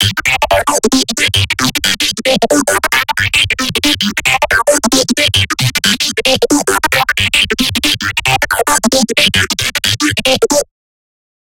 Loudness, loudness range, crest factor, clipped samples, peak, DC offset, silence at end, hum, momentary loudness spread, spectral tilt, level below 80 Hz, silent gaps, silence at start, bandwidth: -11 LUFS; 1 LU; 12 dB; under 0.1%; 0 dBFS; under 0.1%; 0.95 s; none; 2 LU; -2.5 dB/octave; -36 dBFS; none; 0 s; 17.5 kHz